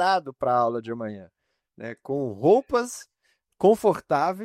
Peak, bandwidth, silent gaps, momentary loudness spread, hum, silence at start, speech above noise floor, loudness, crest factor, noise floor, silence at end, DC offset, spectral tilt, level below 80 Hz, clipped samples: -8 dBFS; 15.5 kHz; none; 19 LU; none; 0 s; 33 dB; -24 LUFS; 18 dB; -56 dBFS; 0 s; under 0.1%; -5.5 dB/octave; -64 dBFS; under 0.1%